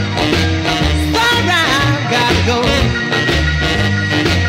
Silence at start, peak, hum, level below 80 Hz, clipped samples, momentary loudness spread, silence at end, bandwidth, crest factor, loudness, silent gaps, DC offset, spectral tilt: 0 s; 0 dBFS; none; -24 dBFS; under 0.1%; 3 LU; 0 s; 16 kHz; 12 dB; -13 LUFS; none; under 0.1%; -4.5 dB/octave